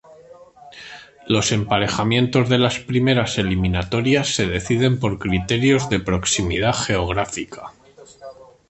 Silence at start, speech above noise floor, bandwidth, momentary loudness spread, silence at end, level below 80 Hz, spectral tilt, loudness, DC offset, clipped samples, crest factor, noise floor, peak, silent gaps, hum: 0.1 s; 26 dB; 8.8 kHz; 20 LU; 0.25 s; -38 dBFS; -4.5 dB/octave; -19 LUFS; under 0.1%; under 0.1%; 18 dB; -45 dBFS; -2 dBFS; none; none